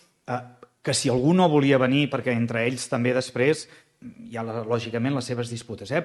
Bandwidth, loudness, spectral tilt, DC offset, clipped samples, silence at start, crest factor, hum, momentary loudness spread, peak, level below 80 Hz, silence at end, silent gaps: 12 kHz; -24 LUFS; -5.5 dB/octave; under 0.1%; under 0.1%; 0.3 s; 18 dB; none; 14 LU; -8 dBFS; -62 dBFS; 0 s; none